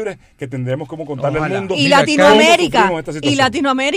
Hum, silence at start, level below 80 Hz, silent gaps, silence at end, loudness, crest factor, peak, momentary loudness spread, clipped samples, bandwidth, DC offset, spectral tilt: none; 0 s; -46 dBFS; none; 0 s; -13 LUFS; 14 dB; 0 dBFS; 16 LU; under 0.1%; 15.5 kHz; under 0.1%; -4.5 dB/octave